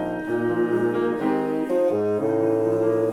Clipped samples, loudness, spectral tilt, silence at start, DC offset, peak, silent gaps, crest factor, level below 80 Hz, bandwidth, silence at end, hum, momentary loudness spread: under 0.1%; -23 LUFS; -8 dB/octave; 0 s; under 0.1%; -10 dBFS; none; 12 dB; -60 dBFS; 13 kHz; 0 s; none; 3 LU